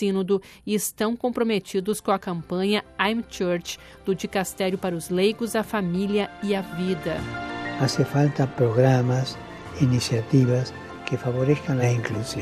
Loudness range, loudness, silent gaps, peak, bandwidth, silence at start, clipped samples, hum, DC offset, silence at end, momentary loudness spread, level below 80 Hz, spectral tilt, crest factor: 3 LU; -24 LUFS; none; -6 dBFS; 14.5 kHz; 0 s; under 0.1%; none; under 0.1%; 0 s; 9 LU; -54 dBFS; -6 dB/octave; 18 dB